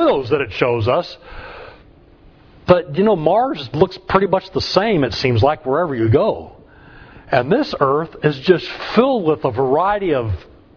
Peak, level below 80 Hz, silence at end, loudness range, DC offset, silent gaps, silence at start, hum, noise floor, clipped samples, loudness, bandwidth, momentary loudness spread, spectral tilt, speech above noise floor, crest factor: 0 dBFS; -44 dBFS; 0.35 s; 2 LU; under 0.1%; none; 0 s; none; -46 dBFS; under 0.1%; -17 LUFS; 5.4 kHz; 10 LU; -7.5 dB/octave; 30 dB; 18 dB